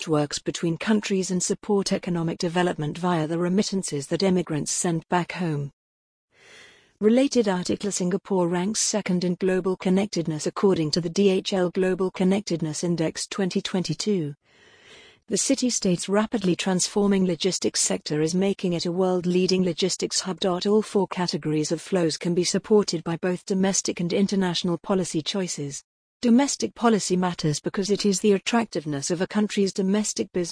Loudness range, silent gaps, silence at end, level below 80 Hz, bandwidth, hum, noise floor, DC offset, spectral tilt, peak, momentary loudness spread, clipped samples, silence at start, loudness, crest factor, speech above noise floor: 3 LU; 5.73-6.28 s, 25.84-26.20 s; 0 s; -60 dBFS; 10.5 kHz; none; -52 dBFS; under 0.1%; -4.5 dB/octave; -6 dBFS; 6 LU; under 0.1%; 0 s; -24 LUFS; 18 dB; 29 dB